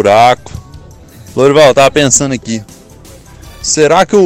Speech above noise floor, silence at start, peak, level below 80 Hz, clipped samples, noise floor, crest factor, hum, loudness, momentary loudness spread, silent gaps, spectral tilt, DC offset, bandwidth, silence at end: 27 dB; 0 s; 0 dBFS; -38 dBFS; under 0.1%; -35 dBFS; 10 dB; none; -9 LUFS; 16 LU; none; -3.5 dB/octave; under 0.1%; over 20 kHz; 0 s